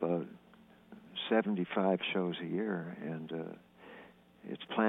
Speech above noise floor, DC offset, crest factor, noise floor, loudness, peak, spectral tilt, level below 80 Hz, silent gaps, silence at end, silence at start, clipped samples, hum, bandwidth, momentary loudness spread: 26 dB; under 0.1%; 20 dB; -61 dBFS; -35 LUFS; -16 dBFS; -8.5 dB/octave; -80 dBFS; none; 0 s; 0 s; under 0.1%; 60 Hz at -60 dBFS; 4 kHz; 22 LU